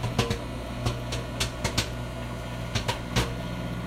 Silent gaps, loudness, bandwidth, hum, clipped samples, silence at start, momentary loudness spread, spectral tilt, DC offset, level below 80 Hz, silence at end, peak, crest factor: none; -30 LUFS; 16 kHz; 60 Hz at -35 dBFS; under 0.1%; 0 s; 7 LU; -4.5 dB/octave; under 0.1%; -38 dBFS; 0 s; -8 dBFS; 22 dB